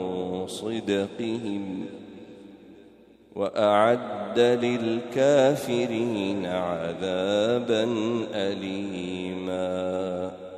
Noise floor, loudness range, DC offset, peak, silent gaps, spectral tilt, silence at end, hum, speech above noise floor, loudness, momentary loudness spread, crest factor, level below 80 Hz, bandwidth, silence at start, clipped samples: -53 dBFS; 6 LU; under 0.1%; -8 dBFS; none; -5.5 dB/octave; 0 s; none; 28 dB; -26 LUFS; 11 LU; 18 dB; -70 dBFS; 14 kHz; 0 s; under 0.1%